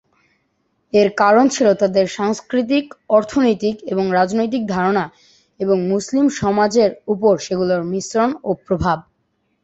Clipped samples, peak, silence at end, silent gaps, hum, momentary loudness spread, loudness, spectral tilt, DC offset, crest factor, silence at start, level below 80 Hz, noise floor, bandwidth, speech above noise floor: under 0.1%; -2 dBFS; 0.6 s; none; none; 7 LU; -17 LUFS; -5.5 dB/octave; under 0.1%; 16 dB; 0.95 s; -48 dBFS; -67 dBFS; 8.2 kHz; 50 dB